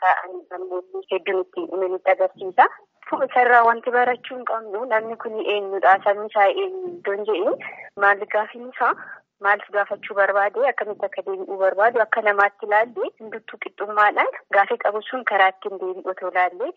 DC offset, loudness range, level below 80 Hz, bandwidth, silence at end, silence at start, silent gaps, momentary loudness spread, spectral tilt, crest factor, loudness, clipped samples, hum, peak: under 0.1%; 3 LU; -82 dBFS; 6 kHz; 0.05 s; 0 s; none; 12 LU; 0 dB/octave; 20 dB; -21 LUFS; under 0.1%; none; -2 dBFS